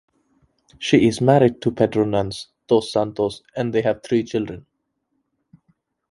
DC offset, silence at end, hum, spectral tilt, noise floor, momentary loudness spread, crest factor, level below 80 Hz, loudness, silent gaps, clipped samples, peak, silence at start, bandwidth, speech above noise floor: under 0.1%; 1.5 s; none; -6.5 dB/octave; -73 dBFS; 13 LU; 20 dB; -52 dBFS; -20 LUFS; none; under 0.1%; 0 dBFS; 0.8 s; 11.5 kHz; 54 dB